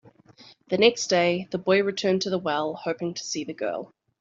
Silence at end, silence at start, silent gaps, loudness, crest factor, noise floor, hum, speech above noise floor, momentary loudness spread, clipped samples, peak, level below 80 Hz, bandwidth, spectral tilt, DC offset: 0.35 s; 0.4 s; none; -25 LUFS; 22 dB; -53 dBFS; none; 28 dB; 10 LU; under 0.1%; -4 dBFS; -70 dBFS; 8 kHz; -4 dB/octave; under 0.1%